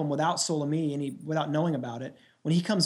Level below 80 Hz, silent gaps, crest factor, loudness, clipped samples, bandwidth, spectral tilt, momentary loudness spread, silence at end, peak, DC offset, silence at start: -76 dBFS; none; 16 dB; -29 LUFS; under 0.1%; 12 kHz; -5 dB/octave; 11 LU; 0 s; -12 dBFS; under 0.1%; 0 s